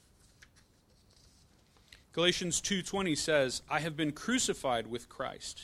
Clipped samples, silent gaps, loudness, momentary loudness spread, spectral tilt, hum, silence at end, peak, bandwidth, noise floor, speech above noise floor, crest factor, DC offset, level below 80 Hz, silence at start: under 0.1%; none; -32 LUFS; 10 LU; -3 dB/octave; none; 0 s; -14 dBFS; 15 kHz; -65 dBFS; 32 dB; 22 dB; under 0.1%; -60 dBFS; 1.9 s